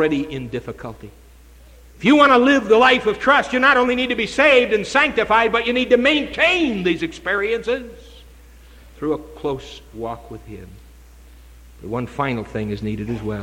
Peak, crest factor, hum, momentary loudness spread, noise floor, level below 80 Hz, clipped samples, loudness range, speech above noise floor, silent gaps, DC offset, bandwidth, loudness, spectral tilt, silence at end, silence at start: -2 dBFS; 16 dB; none; 19 LU; -45 dBFS; -44 dBFS; under 0.1%; 16 LU; 27 dB; none; under 0.1%; 15.5 kHz; -17 LUFS; -5 dB/octave; 0 s; 0 s